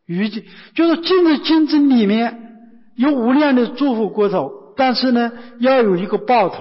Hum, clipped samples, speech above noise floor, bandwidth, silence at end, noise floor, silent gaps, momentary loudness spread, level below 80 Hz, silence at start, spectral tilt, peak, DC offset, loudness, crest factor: none; under 0.1%; 28 dB; 5.8 kHz; 0 s; -43 dBFS; none; 9 LU; -62 dBFS; 0.1 s; -10 dB/octave; -6 dBFS; under 0.1%; -16 LUFS; 10 dB